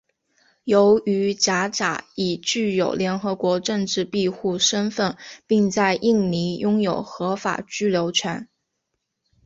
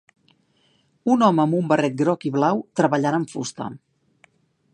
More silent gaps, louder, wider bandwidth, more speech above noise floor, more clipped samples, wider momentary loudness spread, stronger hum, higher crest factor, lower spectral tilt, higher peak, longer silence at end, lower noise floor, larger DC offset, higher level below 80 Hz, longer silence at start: neither; about the same, -21 LUFS vs -21 LUFS; second, 8 kHz vs 10.5 kHz; first, 56 dB vs 43 dB; neither; second, 8 LU vs 12 LU; neither; about the same, 18 dB vs 20 dB; second, -4 dB/octave vs -6.5 dB/octave; about the same, -4 dBFS vs -2 dBFS; about the same, 1 s vs 0.95 s; first, -78 dBFS vs -63 dBFS; neither; first, -60 dBFS vs -70 dBFS; second, 0.65 s vs 1.05 s